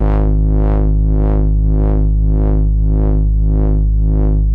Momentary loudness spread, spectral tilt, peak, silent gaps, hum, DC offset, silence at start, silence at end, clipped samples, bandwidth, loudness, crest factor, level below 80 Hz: 1 LU; -12.5 dB/octave; -4 dBFS; none; none; under 0.1%; 0 s; 0 s; under 0.1%; 2.2 kHz; -15 LUFS; 6 dB; -12 dBFS